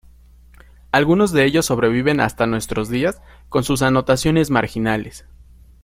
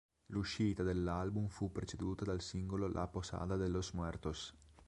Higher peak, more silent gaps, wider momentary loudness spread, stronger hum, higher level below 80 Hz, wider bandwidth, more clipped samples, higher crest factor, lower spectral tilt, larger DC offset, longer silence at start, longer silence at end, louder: first, -2 dBFS vs -24 dBFS; neither; about the same, 8 LU vs 6 LU; neither; first, -40 dBFS vs -52 dBFS; first, 16.5 kHz vs 11.5 kHz; neither; about the same, 18 dB vs 16 dB; about the same, -5.5 dB/octave vs -6 dB/octave; neither; first, 0.95 s vs 0.3 s; first, 0.65 s vs 0.05 s; first, -18 LUFS vs -41 LUFS